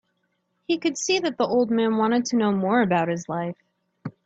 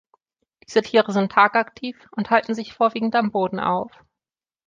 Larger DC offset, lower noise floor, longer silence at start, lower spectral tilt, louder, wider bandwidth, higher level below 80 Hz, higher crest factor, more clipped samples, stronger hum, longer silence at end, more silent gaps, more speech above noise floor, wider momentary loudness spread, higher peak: neither; second, -73 dBFS vs under -90 dBFS; about the same, 0.7 s vs 0.7 s; about the same, -4.5 dB/octave vs -5.5 dB/octave; about the same, -23 LUFS vs -21 LUFS; about the same, 8 kHz vs 7.6 kHz; about the same, -66 dBFS vs -64 dBFS; about the same, 16 dB vs 20 dB; neither; neither; second, 0.15 s vs 0.8 s; neither; second, 50 dB vs over 69 dB; about the same, 11 LU vs 13 LU; second, -8 dBFS vs -2 dBFS